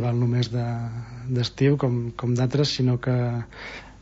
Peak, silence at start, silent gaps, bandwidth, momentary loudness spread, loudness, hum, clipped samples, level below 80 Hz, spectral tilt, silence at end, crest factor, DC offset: -8 dBFS; 0 s; none; 8 kHz; 12 LU; -24 LUFS; none; under 0.1%; -50 dBFS; -7 dB/octave; 0 s; 16 dB; under 0.1%